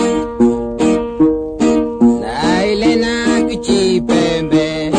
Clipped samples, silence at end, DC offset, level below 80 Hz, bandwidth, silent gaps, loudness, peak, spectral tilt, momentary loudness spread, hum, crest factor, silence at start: under 0.1%; 0 s; under 0.1%; -36 dBFS; 9.6 kHz; none; -14 LUFS; 0 dBFS; -5 dB/octave; 2 LU; none; 14 dB; 0 s